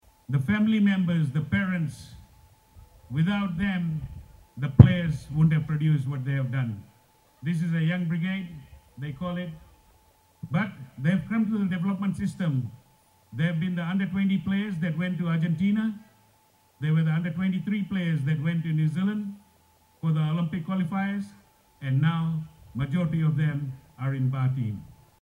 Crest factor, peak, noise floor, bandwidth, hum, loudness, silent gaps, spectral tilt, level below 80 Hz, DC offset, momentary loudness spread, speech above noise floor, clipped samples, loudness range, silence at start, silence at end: 26 dB; 0 dBFS; -62 dBFS; 11 kHz; none; -26 LUFS; none; -8.5 dB/octave; -50 dBFS; under 0.1%; 12 LU; 37 dB; under 0.1%; 7 LU; 0.3 s; 0.3 s